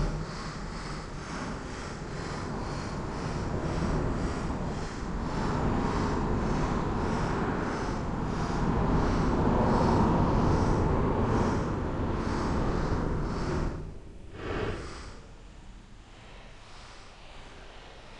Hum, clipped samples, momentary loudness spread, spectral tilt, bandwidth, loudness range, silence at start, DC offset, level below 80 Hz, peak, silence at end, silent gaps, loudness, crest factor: none; under 0.1%; 22 LU; -7 dB/octave; 10 kHz; 13 LU; 0 s; under 0.1%; -36 dBFS; -12 dBFS; 0 s; none; -30 LUFS; 16 dB